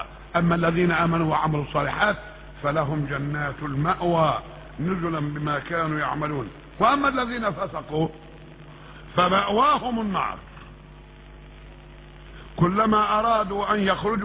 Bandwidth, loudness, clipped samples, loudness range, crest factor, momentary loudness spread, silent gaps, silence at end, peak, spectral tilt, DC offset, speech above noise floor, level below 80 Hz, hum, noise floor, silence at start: 4 kHz; -24 LUFS; under 0.1%; 3 LU; 18 dB; 17 LU; none; 0 s; -6 dBFS; -10 dB/octave; under 0.1%; 22 dB; -46 dBFS; none; -45 dBFS; 0 s